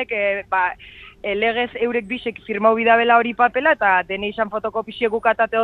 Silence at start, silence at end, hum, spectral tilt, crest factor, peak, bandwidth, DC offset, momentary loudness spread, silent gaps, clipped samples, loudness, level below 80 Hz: 0 s; 0 s; none; -6.5 dB/octave; 18 dB; -2 dBFS; 4.5 kHz; under 0.1%; 11 LU; none; under 0.1%; -19 LUFS; -54 dBFS